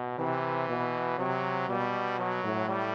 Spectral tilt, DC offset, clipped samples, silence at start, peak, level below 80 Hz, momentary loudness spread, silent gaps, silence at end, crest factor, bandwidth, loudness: -7.5 dB/octave; under 0.1%; under 0.1%; 0 s; -14 dBFS; -78 dBFS; 1 LU; none; 0 s; 16 dB; 7.8 kHz; -31 LUFS